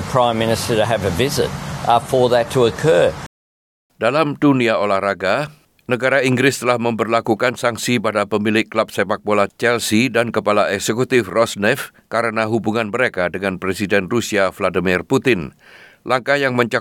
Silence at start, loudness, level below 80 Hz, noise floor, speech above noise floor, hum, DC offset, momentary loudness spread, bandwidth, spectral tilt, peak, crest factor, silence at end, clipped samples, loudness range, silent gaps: 0 s; -17 LUFS; -50 dBFS; under -90 dBFS; over 73 dB; none; under 0.1%; 6 LU; 18 kHz; -5 dB/octave; -2 dBFS; 16 dB; 0 s; under 0.1%; 2 LU; 3.26-3.90 s